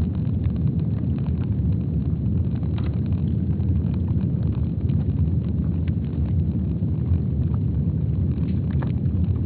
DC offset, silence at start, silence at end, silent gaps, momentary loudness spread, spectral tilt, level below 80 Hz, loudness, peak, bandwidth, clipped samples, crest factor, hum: under 0.1%; 0 s; 0 s; none; 2 LU; -11.5 dB/octave; -30 dBFS; -24 LUFS; -10 dBFS; 4.3 kHz; under 0.1%; 12 dB; none